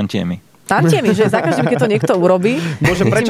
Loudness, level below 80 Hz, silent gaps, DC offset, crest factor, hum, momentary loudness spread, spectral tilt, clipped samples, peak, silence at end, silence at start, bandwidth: -15 LUFS; -44 dBFS; none; under 0.1%; 12 dB; none; 7 LU; -6.5 dB/octave; under 0.1%; -2 dBFS; 0 s; 0 s; 15 kHz